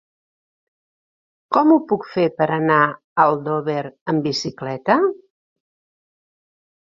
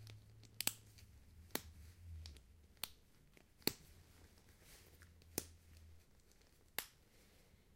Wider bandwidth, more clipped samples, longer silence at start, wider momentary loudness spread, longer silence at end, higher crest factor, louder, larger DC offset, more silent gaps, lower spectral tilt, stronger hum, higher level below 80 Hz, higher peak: second, 7.6 kHz vs 16 kHz; neither; first, 1.5 s vs 0 s; second, 10 LU vs 26 LU; first, 1.75 s vs 0 s; second, 20 dB vs 40 dB; first, -19 LUFS vs -47 LUFS; neither; first, 3.04-3.16 s, 4.01-4.06 s vs none; first, -6 dB/octave vs -2 dB/octave; neither; about the same, -66 dBFS vs -66 dBFS; first, 0 dBFS vs -14 dBFS